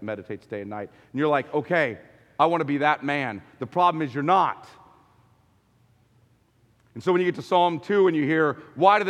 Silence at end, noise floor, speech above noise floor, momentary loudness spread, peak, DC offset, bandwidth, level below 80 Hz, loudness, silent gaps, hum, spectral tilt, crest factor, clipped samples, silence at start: 0 s; -62 dBFS; 39 dB; 14 LU; -2 dBFS; under 0.1%; 9.8 kHz; -72 dBFS; -24 LUFS; none; none; -7 dB/octave; 22 dB; under 0.1%; 0 s